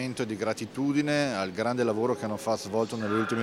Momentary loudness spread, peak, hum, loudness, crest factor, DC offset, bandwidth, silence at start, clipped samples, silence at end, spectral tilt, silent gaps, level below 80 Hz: 5 LU; -10 dBFS; none; -29 LUFS; 18 dB; under 0.1%; 15.5 kHz; 0 s; under 0.1%; 0 s; -5.5 dB/octave; none; -68 dBFS